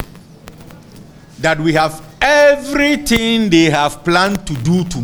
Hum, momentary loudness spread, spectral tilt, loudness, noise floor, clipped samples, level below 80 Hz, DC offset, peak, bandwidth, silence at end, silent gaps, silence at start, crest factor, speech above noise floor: none; 8 LU; -5 dB/octave; -13 LUFS; -38 dBFS; under 0.1%; -36 dBFS; under 0.1%; 0 dBFS; over 20 kHz; 0 s; none; 0 s; 14 dB; 25 dB